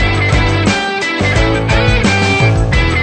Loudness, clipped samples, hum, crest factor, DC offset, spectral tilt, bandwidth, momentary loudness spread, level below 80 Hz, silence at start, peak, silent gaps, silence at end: -12 LUFS; under 0.1%; none; 12 dB; under 0.1%; -5.5 dB/octave; 9.4 kHz; 3 LU; -20 dBFS; 0 s; 0 dBFS; none; 0 s